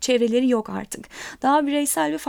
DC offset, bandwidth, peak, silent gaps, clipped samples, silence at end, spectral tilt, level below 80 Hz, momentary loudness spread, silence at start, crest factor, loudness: under 0.1%; 19.5 kHz; -8 dBFS; none; under 0.1%; 0 s; -3 dB/octave; -58 dBFS; 14 LU; 0 s; 14 dB; -21 LUFS